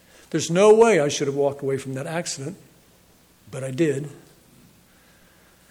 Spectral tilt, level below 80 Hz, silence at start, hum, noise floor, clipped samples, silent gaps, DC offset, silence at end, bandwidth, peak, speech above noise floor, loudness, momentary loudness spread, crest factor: -5 dB/octave; -64 dBFS; 0.35 s; none; -56 dBFS; under 0.1%; none; under 0.1%; 1.55 s; 14.5 kHz; -4 dBFS; 35 dB; -21 LUFS; 18 LU; 18 dB